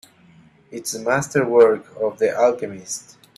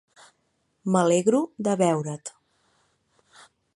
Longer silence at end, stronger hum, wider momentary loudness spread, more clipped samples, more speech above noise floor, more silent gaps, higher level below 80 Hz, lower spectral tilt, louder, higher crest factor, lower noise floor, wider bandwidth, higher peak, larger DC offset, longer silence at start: second, 0.35 s vs 1.45 s; neither; about the same, 16 LU vs 16 LU; neither; second, 32 dB vs 49 dB; neither; first, -62 dBFS vs -72 dBFS; second, -4.5 dB/octave vs -6 dB/octave; first, -19 LUFS vs -24 LUFS; about the same, 18 dB vs 20 dB; second, -51 dBFS vs -72 dBFS; first, 13.5 kHz vs 11.5 kHz; first, -2 dBFS vs -8 dBFS; neither; second, 0.7 s vs 0.85 s